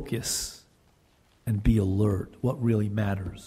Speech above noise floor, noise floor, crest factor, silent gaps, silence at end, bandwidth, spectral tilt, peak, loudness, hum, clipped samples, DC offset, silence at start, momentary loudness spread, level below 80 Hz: 37 dB; -63 dBFS; 18 dB; none; 0 s; 16 kHz; -6 dB/octave; -10 dBFS; -27 LUFS; none; under 0.1%; under 0.1%; 0 s; 7 LU; -40 dBFS